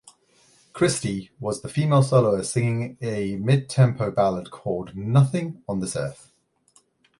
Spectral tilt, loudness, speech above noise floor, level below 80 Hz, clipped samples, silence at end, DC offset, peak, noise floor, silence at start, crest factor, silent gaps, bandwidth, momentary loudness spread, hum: -6.5 dB/octave; -23 LUFS; 39 dB; -54 dBFS; under 0.1%; 1.05 s; under 0.1%; -4 dBFS; -62 dBFS; 0.75 s; 18 dB; none; 11.5 kHz; 11 LU; none